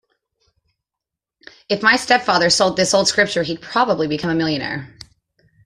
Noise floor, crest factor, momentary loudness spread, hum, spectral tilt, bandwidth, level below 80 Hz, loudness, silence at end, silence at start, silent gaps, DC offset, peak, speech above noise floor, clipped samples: -85 dBFS; 18 dB; 9 LU; none; -3 dB/octave; 13 kHz; -56 dBFS; -17 LUFS; 0.8 s; 1.7 s; none; under 0.1%; -2 dBFS; 68 dB; under 0.1%